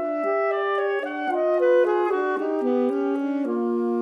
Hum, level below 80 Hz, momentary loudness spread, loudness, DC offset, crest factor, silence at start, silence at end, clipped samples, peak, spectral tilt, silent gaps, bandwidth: none; -86 dBFS; 6 LU; -23 LUFS; under 0.1%; 12 dB; 0 s; 0 s; under 0.1%; -10 dBFS; -6 dB/octave; none; 6.4 kHz